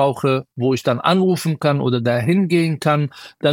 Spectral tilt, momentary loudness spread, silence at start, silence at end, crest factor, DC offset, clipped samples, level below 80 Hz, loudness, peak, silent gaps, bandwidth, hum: -6.5 dB/octave; 4 LU; 0 s; 0 s; 16 dB; under 0.1%; under 0.1%; -62 dBFS; -18 LUFS; -2 dBFS; none; 17 kHz; none